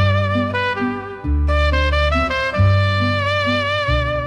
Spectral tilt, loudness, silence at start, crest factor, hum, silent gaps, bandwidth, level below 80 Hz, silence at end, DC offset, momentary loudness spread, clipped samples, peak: -6.5 dB/octave; -18 LUFS; 0 s; 12 dB; none; none; 9.4 kHz; -24 dBFS; 0 s; under 0.1%; 5 LU; under 0.1%; -6 dBFS